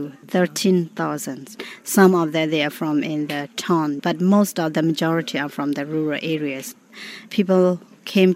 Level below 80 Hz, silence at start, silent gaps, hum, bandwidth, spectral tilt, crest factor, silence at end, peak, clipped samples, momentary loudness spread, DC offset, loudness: -76 dBFS; 0 s; none; none; 16 kHz; -5.5 dB/octave; 20 dB; 0 s; 0 dBFS; under 0.1%; 14 LU; under 0.1%; -21 LUFS